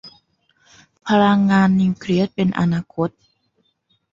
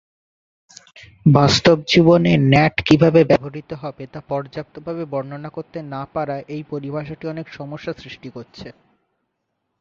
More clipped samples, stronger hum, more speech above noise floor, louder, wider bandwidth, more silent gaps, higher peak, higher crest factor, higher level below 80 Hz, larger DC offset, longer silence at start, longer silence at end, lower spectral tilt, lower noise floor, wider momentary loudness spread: neither; neither; second, 50 dB vs 56 dB; about the same, -18 LUFS vs -17 LUFS; about the same, 7.6 kHz vs 7.8 kHz; neither; second, -4 dBFS vs 0 dBFS; about the same, 16 dB vs 18 dB; second, -54 dBFS vs -48 dBFS; neither; second, 0.05 s vs 1.25 s; about the same, 1.05 s vs 1.1 s; about the same, -7.5 dB/octave vs -6.5 dB/octave; second, -67 dBFS vs -75 dBFS; second, 11 LU vs 19 LU